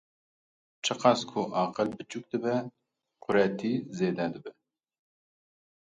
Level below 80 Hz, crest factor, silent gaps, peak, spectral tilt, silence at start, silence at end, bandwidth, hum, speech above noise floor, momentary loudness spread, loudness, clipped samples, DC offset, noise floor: -72 dBFS; 24 dB; none; -8 dBFS; -5 dB/octave; 0.85 s; 1.4 s; 9.6 kHz; none; 29 dB; 16 LU; -29 LUFS; under 0.1%; under 0.1%; -58 dBFS